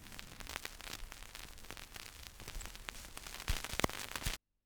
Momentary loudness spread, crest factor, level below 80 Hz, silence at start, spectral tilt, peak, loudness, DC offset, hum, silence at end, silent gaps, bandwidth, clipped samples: 13 LU; 32 dB; -50 dBFS; 0 s; -2.5 dB/octave; -12 dBFS; -44 LUFS; under 0.1%; none; 0.3 s; none; over 20 kHz; under 0.1%